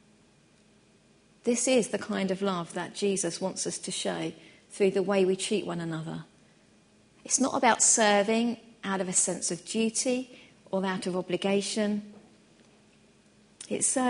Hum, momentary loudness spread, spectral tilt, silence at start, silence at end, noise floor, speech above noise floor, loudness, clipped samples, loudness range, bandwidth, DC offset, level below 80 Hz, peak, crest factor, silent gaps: none; 13 LU; -3 dB/octave; 1.45 s; 0 s; -61 dBFS; 34 dB; -28 LUFS; under 0.1%; 6 LU; 11 kHz; under 0.1%; -74 dBFS; -8 dBFS; 22 dB; none